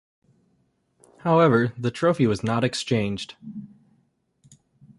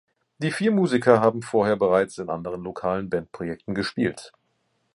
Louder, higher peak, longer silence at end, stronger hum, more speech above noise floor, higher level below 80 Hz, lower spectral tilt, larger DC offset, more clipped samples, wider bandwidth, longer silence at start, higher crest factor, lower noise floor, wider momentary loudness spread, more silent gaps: about the same, -22 LUFS vs -24 LUFS; second, -6 dBFS vs -2 dBFS; first, 1.35 s vs 0.65 s; neither; about the same, 46 dB vs 48 dB; about the same, -58 dBFS vs -58 dBFS; about the same, -6.5 dB/octave vs -6.5 dB/octave; neither; neither; about the same, 11.5 kHz vs 11.5 kHz; first, 1.25 s vs 0.4 s; about the same, 18 dB vs 22 dB; about the same, -68 dBFS vs -71 dBFS; first, 19 LU vs 12 LU; neither